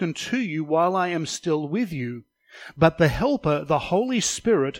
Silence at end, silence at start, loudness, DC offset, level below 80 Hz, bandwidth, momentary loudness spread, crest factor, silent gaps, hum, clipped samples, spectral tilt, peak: 0 s; 0 s; -23 LUFS; under 0.1%; -48 dBFS; 16.5 kHz; 10 LU; 20 dB; none; none; under 0.1%; -5 dB/octave; -4 dBFS